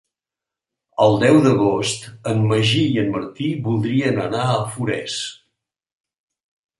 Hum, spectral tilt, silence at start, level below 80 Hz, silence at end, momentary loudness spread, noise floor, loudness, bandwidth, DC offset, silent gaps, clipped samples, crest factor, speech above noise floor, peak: none; -5.5 dB/octave; 1 s; -54 dBFS; 1.45 s; 11 LU; -88 dBFS; -19 LUFS; 11.5 kHz; under 0.1%; none; under 0.1%; 18 dB; 69 dB; -2 dBFS